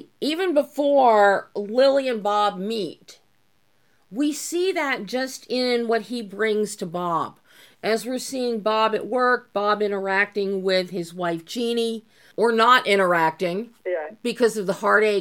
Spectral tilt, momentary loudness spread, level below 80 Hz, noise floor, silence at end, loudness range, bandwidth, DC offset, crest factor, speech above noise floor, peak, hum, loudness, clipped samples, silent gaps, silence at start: -4 dB/octave; 11 LU; -82 dBFS; -67 dBFS; 0 s; 5 LU; 17.5 kHz; under 0.1%; 18 dB; 45 dB; -4 dBFS; none; -22 LUFS; under 0.1%; none; 0.2 s